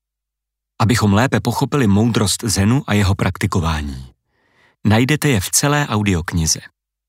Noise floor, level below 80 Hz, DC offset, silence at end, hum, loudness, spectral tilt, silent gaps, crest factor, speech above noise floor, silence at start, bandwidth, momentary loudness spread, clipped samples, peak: -82 dBFS; -36 dBFS; under 0.1%; 0.4 s; none; -17 LUFS; -4.5 dB/octave; none; 16 dB; 66 dB; 0.8 s; 16 kHz; 6 LU; under 0.1%; -2 dBFS